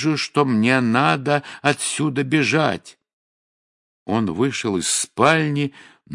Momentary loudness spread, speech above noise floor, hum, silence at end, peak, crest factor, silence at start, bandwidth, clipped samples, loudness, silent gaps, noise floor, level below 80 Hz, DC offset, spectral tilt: 7 LU; over 70 dB; none; 0 s; 0 dBFS; 20 dB; 0 s; 11.5 kHz; under 0.1%; -19 LUFS; 3.13-4.06 s; under -90 dBFS; -64 dBFS; under 0.1%; -4.5 dB/octave